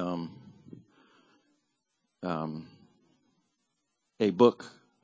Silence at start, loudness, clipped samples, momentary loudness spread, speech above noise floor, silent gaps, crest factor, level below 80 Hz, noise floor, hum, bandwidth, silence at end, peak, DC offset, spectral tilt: 0 s; -29 LUFS; under 0.1%; 23 LU; 53 dB; none; 26 dB; -72 dBFS; -80 dBFS; none; 8 kHz; 0.35 s; -8 dBFS; under 0.1%; -7.5 dB/octave